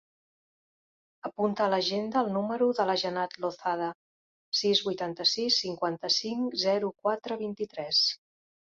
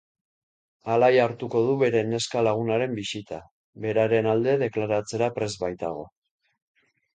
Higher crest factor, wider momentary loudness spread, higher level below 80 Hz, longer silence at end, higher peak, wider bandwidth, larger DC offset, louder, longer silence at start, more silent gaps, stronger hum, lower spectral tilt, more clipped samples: about the same, 18 dB vs 18 dB; second, 9 LU vs 13 LU; second, -76 dBFS vs -62 dBFS; second, 0.5 s vs 1.1 s; second, -12 dBFS vs -8 dBFS; second, 7.8 kHz vs 9.4 kHz; neither; second, -28 LUFS vs -24 LUFS; first, 1.25 s vs 0.85 s; first, 3.95-4.52 s vs 3.51-3.73 s; neither; second, -3.5 dB/octave vs -5.5 dB/octave; neither